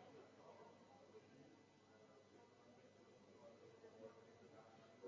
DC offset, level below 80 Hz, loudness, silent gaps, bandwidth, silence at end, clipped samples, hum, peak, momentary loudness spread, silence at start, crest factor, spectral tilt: under 0.1%; under -90 dBFS; -66 LUFS; none; 7.2 kHz; 0 s; under 0.1%; 50 Hz at -80 dBFS; -46 dBFS; 6 LU; 0 s; 18 dB; -4.5 dB/octave